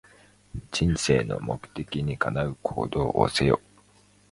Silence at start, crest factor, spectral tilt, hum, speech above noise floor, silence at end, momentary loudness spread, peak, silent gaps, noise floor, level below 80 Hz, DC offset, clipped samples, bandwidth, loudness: 0.55 s; 22 dB; -5.5 dB/octave; 50 Hz at -50 dBFS; 33 dB; 0.75 s; 11 LU; -6 dBFS; none; -59 dBFS; -44 dBFS; under 0.1%; under 0.1%; 11.5 kHz; -26 LUFS